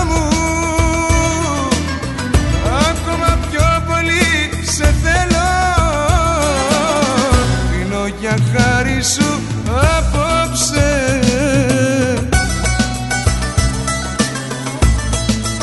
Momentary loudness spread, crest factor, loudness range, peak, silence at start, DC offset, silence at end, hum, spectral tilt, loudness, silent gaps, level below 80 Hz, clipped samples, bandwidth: 4 LU; 14 dB; 2 LU; 0 dBFS; 0 s; under 0.1%; 0 s; none; -4.5 dB/octave; -15 LUFS; none; -22 dBFS; under 0.1%; 12 kHz